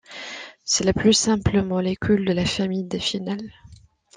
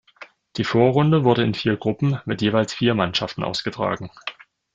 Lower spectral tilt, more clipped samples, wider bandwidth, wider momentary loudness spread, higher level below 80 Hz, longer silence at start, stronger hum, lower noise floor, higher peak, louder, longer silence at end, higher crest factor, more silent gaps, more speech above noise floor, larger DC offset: second, -4 dB/octave vs -6.5 dB/octave; neither; first, 10 kHz vs 7.8 kHz; first, 16 LU vs 12 LU; first, -46 dBFS vs -56 dBFS; about the same, 0.1 s vs 0.2 s; neither; first, -50 dBFS vs -46 dBFS; second, -6 dBFS vs -2 dBFS; about the same, -22 LUFS vs -21 LUFS; about the same, 0.4 s vs 0.45 s; about the same, 18 dB vs 20 dB; neither; about the same, 28 dB vs 26 dB; neither